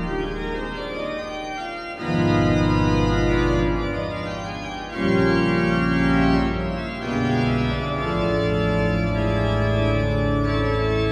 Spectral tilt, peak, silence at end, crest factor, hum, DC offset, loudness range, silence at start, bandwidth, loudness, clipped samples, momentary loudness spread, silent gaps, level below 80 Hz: -7 dB/octave; -6 dBFS; 0 s; 16 dB; none; under 0.1%; 1 LU; 0 s; 9.8 kHz; -22 LUFS; under 0.1%; 10 LU; none; -32 dBFS